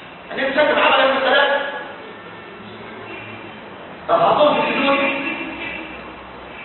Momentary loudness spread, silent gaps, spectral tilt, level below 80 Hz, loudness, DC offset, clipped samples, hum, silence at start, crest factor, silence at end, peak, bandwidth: 21 LU; none; -9 dB/octave; -54 dBFS; -17 LUFS; under 0.1%; under 0.1%; none; 0 s; 18 dB; 0 s; -2 dBFS; 4.3 kHz